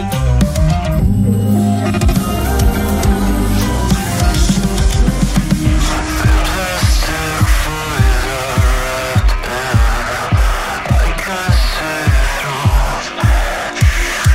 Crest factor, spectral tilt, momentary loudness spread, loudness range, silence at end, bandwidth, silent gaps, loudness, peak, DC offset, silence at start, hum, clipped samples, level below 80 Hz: 12 dB; -5 dB/octave; 3 LU; 1 LU; 0 s; 16 kHz; none; -15 LUFS; 0 dBFS; under 0.1%; 0 s; none; under 0.1%; -16 dBFS